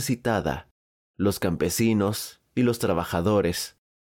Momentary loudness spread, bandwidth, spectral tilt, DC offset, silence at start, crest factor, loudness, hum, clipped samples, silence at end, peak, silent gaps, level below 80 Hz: 9 LU; 18.5 kHz; -5.5 dB/octave; under 0.1%; 0 s; 14 dB; -25 LUFS; none; under 0.1%; 0.35 s; -12 dBFS; 0.71-1.14 s; -48 dBFS